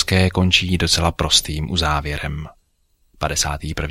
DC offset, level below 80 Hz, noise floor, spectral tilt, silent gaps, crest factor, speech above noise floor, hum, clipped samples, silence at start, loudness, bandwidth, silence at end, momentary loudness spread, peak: under 0.1%; -32 dBFS; -62 dBFS; -3.5 dB/octave; none; 18 dB; 43 dB; none; under 0.1%; 0 s; -18 LUFS; 15.5 kHz; 0 s; 11 LU; -2 dBFS